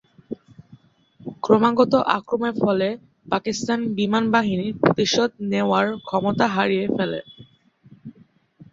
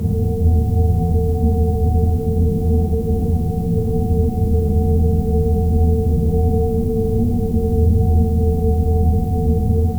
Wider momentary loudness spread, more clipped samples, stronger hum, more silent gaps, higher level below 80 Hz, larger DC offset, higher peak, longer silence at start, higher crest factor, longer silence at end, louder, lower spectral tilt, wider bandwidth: first, 16 LU vs 3 LU; neither; neither; neither; second, -60 dBFS vs -20 dBFS; neither; about the same, -2 dBFS vs -4 dBFS; first, 0.3 s vs 0 s; first, 20 dB vs 12 dB; first, 0.6 s vs 0 s; second, -21 LUFS vs -18 LUFS; second, -5.5 dB/octave vs -11 dB/octave; second, 7.6 kHz vs over 20 kHz